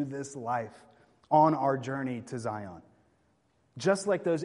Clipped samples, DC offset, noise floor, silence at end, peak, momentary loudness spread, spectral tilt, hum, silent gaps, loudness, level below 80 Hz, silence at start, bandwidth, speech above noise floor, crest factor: under 0.1%; under 0.1%; -70 dBFS; 0 s; -10 dBFS; 14 LU; -6 dB/octave; none; none; -30 LUFS; -72 dBFS; 0 s; 11.5 kHz; 41 dB; 20 dB